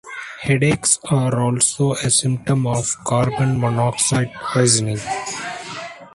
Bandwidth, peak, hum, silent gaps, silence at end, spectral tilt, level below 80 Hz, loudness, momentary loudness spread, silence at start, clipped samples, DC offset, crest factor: 11.5 kHz; 0 dBFS; none; none; 0.05 s; -4 dB/octave; -50 dBFS; -18 LUFS; 11 LU; 0.05 s; under 0.1%; under 0.1%; 18 dB